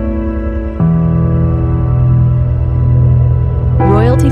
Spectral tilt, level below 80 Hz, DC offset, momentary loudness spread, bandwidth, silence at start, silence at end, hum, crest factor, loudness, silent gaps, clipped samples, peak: -10 dB/octave; -18 dBFS; under 0.1%; 7 LU; 8.4 kHz; 0 s; 0 s; none; 10 dB; -12 LUFS; none; under 0.1%; 0 dBFS